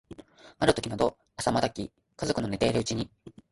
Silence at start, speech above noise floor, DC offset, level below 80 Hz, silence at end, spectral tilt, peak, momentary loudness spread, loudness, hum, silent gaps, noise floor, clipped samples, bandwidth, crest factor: 0.1 s; 21 dB; under 0.1%; -52 dBFS; 0.2 s; -5 dB/octave; -6 dBFS; 14 LU; -29 LUFS; none; none; -49 dBFS; under 0.1%; 11.5 kHz; 24 dB